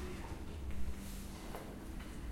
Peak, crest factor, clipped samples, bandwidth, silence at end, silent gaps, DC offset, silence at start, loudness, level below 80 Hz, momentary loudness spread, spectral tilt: -26 dBFS; 16 dB; under 0.1%; 16.5 kHz; 0 s; none; under 0.1%; 0 s; -47 LUFS; -48 dBFS; 3 LU; -5.5 dB/octave